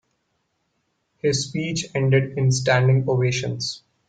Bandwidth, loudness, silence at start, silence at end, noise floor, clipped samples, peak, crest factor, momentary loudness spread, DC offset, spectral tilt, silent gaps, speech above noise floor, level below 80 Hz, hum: 9.2 kHz; -21 LUFS; 1.25 s; 0.3 s; -72 dBFS; under 0.1%; -6 dBFS; 16 dB; 8 LU; under 0.1%; -5 dB/octave; none; 52 dB; -56 dBFS; none